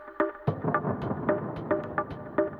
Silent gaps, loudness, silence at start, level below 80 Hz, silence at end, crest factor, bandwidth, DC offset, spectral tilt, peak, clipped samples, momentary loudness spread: none; -30 LUFS; 0 s; -56 dBFS; 0 s; 20 dB; 5.2 kHz; under 0.1%; -10.5 dB/octave; -10 dBFS; under 0.1%; 3 LU